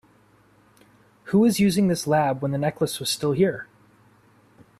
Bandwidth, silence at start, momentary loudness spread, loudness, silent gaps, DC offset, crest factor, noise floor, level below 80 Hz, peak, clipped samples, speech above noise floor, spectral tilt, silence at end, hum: 14.5 kHz; 1.25 s; 6 LU; -22 LUFS; none; under 0.1%; 16 dB; -58 dBFS; -58 dBFS; -8 dBFS; under 0.1%; 36 dB; -5.5 dB/octave; 1.15 s; none